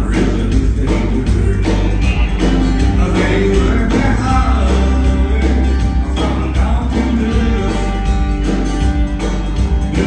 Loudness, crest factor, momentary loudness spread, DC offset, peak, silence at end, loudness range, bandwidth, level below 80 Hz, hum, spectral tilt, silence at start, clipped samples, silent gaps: -15 LUFS; 12 dB; 3 LU; under 0.1%; 0 dBFS; 0 s; 2 LU; 9.4 kHz; -16 dBFS; none; -7 dB/octave; 0 s; under 0.1%; none